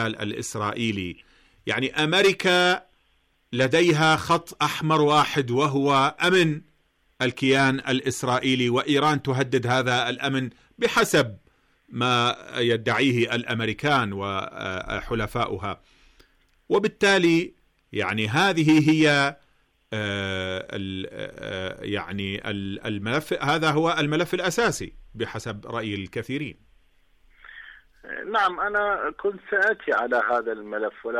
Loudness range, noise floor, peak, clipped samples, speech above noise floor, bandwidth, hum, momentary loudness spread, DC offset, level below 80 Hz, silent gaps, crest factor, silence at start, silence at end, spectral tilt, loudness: 8 LU; -66 dBFS; -10 dBFS; under 0.1%; 42 dB; 15.5 kHz; none; 13 LU; under 0.1%; -54 dBFS; none; 14 dB; 0 s; 0 s; -5 dB/octave; -23 LUFS